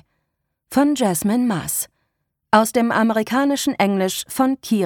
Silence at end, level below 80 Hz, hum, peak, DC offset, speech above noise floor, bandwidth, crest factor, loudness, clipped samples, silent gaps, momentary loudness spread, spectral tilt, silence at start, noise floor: 0 s; -58 dBFS; none; -2 dBFS; under 0.1%; 57 dB; 19 kHz; 18 dB; -19 LUFS; under 0.1%; none; 6 LU; -4.5 dB/octave; 0.7 s; -75 dBFS